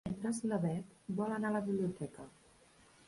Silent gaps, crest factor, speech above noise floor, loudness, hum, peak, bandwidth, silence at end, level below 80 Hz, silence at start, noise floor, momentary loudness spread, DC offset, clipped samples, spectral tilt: none; 16 dB; 27 dB; -38 LUFS; none; -24 dBFS; 11.5 kHz; 0.8 s; -68 dBFS; 0.05 s; -65 dBFS; 11 LU; under 0.1%; under 0.1%; -7 dB/octave